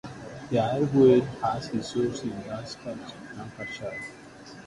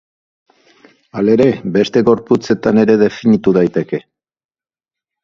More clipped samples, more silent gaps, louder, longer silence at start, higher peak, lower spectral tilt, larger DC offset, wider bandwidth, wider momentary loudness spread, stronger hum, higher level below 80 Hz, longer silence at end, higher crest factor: neither; neither; second, -26 LUFS vs -13 LUFS; second, 0.05 s vs 1.15 s; second, -8 dBFS vs 0 dBFS; about the same, -6.5 dB/octave vs -7.5 dB/octave; neither; first, 11.5 kHz vs 7.2 kHz; first, 21 LU vs 8 LU; neither; second, -58 dBFS vs -50 dBFS; second, 0 s vs 1.25 s; about the same, 18 dB vs 14 dB